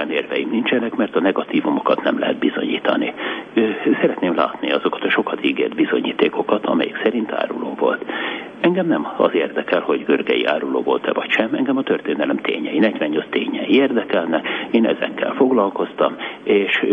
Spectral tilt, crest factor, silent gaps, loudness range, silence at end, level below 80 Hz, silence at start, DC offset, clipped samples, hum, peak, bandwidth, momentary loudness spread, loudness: -7.5 dB/octave; 18 dB; none; 1 LU; 0 s; -66 dBFS; 0 s; under 0.1%; under 0.1%; none; -2 dBFS; 5.6 kHz; 4 LU; -19 LUFS